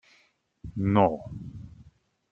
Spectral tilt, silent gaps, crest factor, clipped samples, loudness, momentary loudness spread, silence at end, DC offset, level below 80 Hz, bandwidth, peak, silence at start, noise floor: -9.5 dB/octave; none; 24 dB; under 0.1%; -25 LUFS; 24 LU; 0.5 s; under 0.1%; -54 dBFS; 6.2 kHz; -6 dBFS; 0.65 s; -66 dBFS